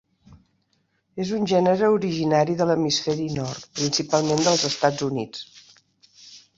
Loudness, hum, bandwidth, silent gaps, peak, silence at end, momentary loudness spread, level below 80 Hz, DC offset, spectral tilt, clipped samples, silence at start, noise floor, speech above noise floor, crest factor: -22 LUFS; none; 8 kHz; none; -4 dBFS; 0.2 s; 11 LU; -60 dBFS; under 0.1%; -4.5 dB/octave; under 0.1%; 0.3 s; -69 dBFS; 47 dB; 20 dB